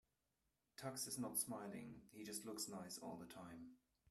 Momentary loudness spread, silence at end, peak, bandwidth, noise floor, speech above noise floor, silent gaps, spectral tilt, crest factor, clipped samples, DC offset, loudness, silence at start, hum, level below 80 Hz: 15 LU; 0.35 s; -30 dBFS; 15 kHz; -89 dBFS; 38 dB; none; -3 dB/octave; 22 dB; under 0.1%; under 0.1%; -49 LUFS; 0.8 s; none; -82 dBFS